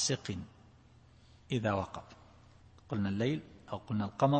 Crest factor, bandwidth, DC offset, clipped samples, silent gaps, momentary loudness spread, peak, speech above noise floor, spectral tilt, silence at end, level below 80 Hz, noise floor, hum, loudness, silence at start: 20 dB; 8.4 kHz; under 0.1%; under 0.1%; none; 17 LU; -14 dBFS; 27 dB; -5 dB/octave; 0 s; -64 dBFS; -60 dBFS; none; -36 LUFS; 0 s